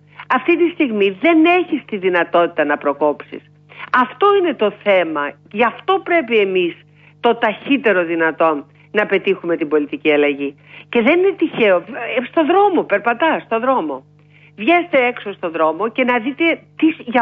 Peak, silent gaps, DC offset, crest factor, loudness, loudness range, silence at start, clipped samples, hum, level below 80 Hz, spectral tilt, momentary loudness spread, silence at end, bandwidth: -2 dBFS; none; under 0.1%; 14 dB; -16 LUFS; 2 LU; 0.2 s; under 0.1%; 50 Hz at -50 dBFS; -68 dBFS; -7.5 dB/octave; 8 LU; 0 s; 5 kHz